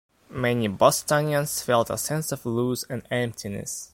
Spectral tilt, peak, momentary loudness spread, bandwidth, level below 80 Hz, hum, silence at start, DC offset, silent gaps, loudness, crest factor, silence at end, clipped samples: -4.5 dB/octave; -4 dBFS; 11 LU; 16.5 kHz; -56 dBFS; none; 0.3 s; under 0.1%; none; -25 LUFS; 22 dB; 0.1 s; under 0.1%